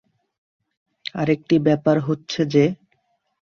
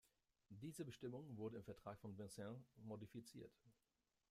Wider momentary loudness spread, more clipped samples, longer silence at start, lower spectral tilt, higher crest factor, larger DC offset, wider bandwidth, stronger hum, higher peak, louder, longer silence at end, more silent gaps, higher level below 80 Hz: first, 14 LU vs 8 LU; neither; first, 1.15 s vs 0.05 s; about the same, -7 dB/octave vs -6 dB/octave; about the same, 18 dB vs 18 dB; neither; second, 7 kHz vs 15.5 kHz; neither; first, -4 dBFS vs -40 dBFS; first, -20 LUFS vs -56 LUFS; about the same, 0.7 s vs 0.6 s; neither; first, -60 dBFS vs -82 dBFS